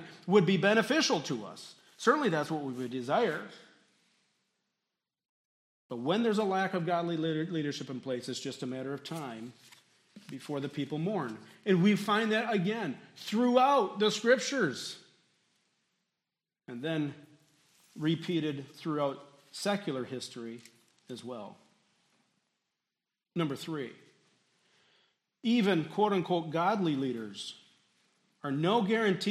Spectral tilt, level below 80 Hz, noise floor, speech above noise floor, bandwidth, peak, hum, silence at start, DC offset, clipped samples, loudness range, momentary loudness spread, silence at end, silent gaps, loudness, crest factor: -5.5 dB/octave; -84 dBFS; under -90 dBFS; over 59 dB; 14 kHz; -10 dBFS; none; 0 s; under 0.1%; under 0.1%; 13 LU; 18 LU; 0 s; 5.29-5.90 s; -31 LUFS; 22 dB